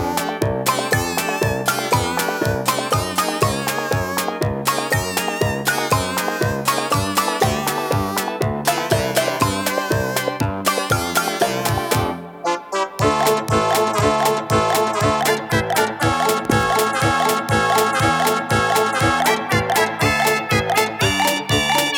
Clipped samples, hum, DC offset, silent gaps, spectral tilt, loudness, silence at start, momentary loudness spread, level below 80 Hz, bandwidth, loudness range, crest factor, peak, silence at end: under 0.1%; none; under 0.1%; none; -4 dB/octave; -19 LUFS; 0 s; 4 LU; -42 dBFS; 19.5 kHz; 3 LU; 18 dB; -2 dBFS; 0 s